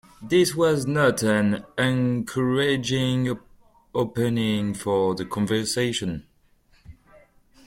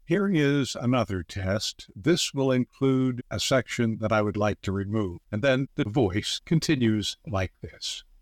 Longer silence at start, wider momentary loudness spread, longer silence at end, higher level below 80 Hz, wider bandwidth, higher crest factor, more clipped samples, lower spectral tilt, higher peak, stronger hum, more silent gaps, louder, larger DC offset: about the same, 0.2 s vs 0.1 s; about the same, 7 LU vs 7 LU; first, 0.75 s vs 0.2 s; about the same, -54 dBFS vs -54 dBFS; about the same, 16.5 kHz vs 16.5 kHz; first, 18 dB vs 12 dB; neither; about the same, -5.5 dB/octave vs -5.5 dB/octave; first, -6 dBFS vs -14 dBFS; neither; neither; first, -23 LUFS vs -26 LUFS; neither